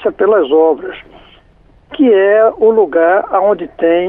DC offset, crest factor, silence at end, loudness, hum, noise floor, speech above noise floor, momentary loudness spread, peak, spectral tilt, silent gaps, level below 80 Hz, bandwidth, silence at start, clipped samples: under 0.1%; 10 dB; 0 s; -11 LUFS; none; -46 dBFS; 36 dB; 11 LU; -2 dBFS; -9 dB/octave; none; -50 dBFS; 3.8 kHz; 0 s; under 0.1%